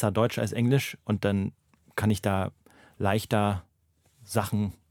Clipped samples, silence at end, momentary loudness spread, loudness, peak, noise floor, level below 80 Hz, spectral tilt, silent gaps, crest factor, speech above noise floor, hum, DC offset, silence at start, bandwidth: under 0.1%; 0.2 s; 7 LU; -28 LUFS; -8 dBFS; -68 dBFS; -60 dBFS; -6.5 dB/octave; none; 20 dB; 41 dB; none; under 0.1%; 0 s; 17.5 kHz